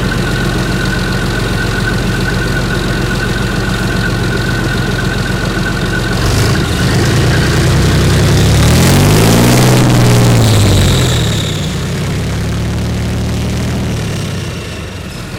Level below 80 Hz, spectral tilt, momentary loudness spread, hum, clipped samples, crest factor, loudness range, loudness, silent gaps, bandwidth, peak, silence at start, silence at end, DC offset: -22 dBFS; -5 dB/octave; 9 LU; none; under 0.1%; 10 dB; 7 LU; -12 LUFS; none; 17.5 kHz; -2 dBFS; 0 s; 0 s; under 0.1%